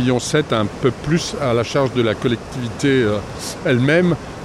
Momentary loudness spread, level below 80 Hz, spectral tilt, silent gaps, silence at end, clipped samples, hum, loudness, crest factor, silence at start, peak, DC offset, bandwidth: 8 LU; -42 dBFS; -5.5 dB/octave; none; 0 s; under 0.1%; none; -18 LUFS; 14 dB; 0 s; -4 dBFS; under 0.1%; 14.5 kHz